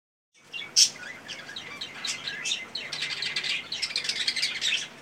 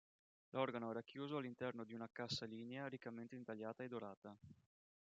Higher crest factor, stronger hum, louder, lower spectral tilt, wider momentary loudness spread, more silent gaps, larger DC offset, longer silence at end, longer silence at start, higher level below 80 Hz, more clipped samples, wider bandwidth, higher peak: about the same, 26 dB vs 24 dB; neither; first, -27 LUFS vs -49 LUFS; second, 1.5 dB/octave vs -4 dB/octave; first, 17 LU vs 11 LU; second, none vs 4.17-4.22 s; neither; second, 0 s vs 0.65 s; about the same, 0.45 s vs 0.55 s; first, -76 dBFS vs -88 dBFS; neither; first, 16.5 kHz vs 8 kHz; first, -4 dBFS vs -26 dBFS